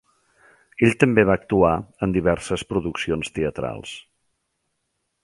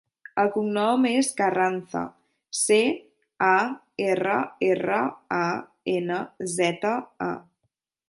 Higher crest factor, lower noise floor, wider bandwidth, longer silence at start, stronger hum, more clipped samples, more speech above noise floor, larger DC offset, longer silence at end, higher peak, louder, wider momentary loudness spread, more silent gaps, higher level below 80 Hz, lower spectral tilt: about the same, 22 dB vs 18 dB; about the same, -75 dBFS vs -77 dBFS; about the same, 11.5 kHz vs 11.5 kHz; first, 0.8 s vs 0.35 s; neither; neither; about the same, 54 dB vs 53 dB; neither; first, 1.25 s vs 0.65 s; first, -2 dBFS vs -8 dBFS; first, -21 LUFS vs -25 LUFS; first, 15 LU vs 10 LU; neither; first, -44 dBFS vs -72 dBFS; first, -6.5 dB/octave vs -4 dB/octave